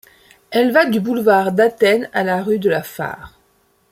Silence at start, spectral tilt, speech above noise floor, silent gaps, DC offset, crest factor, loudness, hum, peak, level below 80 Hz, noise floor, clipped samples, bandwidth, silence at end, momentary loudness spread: 0.5 s; -5.5 dB/octave; 43 dB; none; under 0.1%; 16 dB; -16 LUFS; none; -2 dBFS; -58 dBFS; -59 dBFS; under 0.1%; 16.5 kHz; 0.65 s; 13 LU